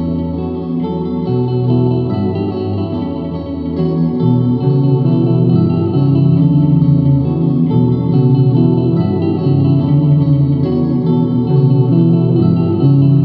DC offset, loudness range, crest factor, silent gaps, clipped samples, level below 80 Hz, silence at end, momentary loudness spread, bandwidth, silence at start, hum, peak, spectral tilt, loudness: under 0.1%; 5 LU; 10 dB; none; under 0.1%; -38 dBFS; 0 s; 8 LU; 4.8 kHz; 0 s; none; -2 dBFS; -13 dB/octave; -13 LUFS